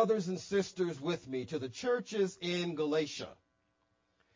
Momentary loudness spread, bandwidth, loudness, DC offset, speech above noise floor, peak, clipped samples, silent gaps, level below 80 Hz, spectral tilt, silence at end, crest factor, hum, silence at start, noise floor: 7 LU; 7.6 kHz; -35 LUFS; under 0.1%; 43 dB; -16 dBFS; under 0.1%; none; -72 dBFS; -5 dB/octave; 1 s; 20 dB; none; 0 s; -77 dBFS